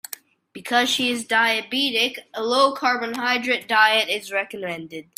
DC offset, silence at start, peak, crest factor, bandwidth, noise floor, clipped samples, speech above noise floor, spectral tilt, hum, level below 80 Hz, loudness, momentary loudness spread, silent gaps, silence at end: under 0.1%; 0.1 s; -2 dBFS; 20 dB; 16 kHz; -42 dBFS; under 0.1%; 20 dB; -1.5 dB/octave; none; -72 dBFS; -20 LUFS; 13 LU; none; 0.15 s